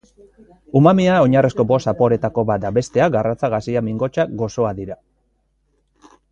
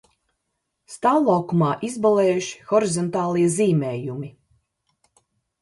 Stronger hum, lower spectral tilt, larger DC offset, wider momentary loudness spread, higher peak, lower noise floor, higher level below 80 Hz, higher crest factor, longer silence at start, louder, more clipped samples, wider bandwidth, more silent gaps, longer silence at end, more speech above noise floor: neither; first, -7.5 dB/octave vs -6 dB/octave; neither; second, 8 LU vs 12 LU; first, 0 dBFS vs -6 dBFS; second, -65 dBFS vs -77 dBFS; first, -48 dBFS vs -66 dBFS; about the same, 18 dB vs 16 dB; second, 0.75 s vs 0.9 s; first, -17 LUFS vs -21 LUFS; neither; second, 9.2 kHz vs 11.5 kHz; neither; about the same, 1.4 s vs 1.3 s; second, 48 dB vs 57 dB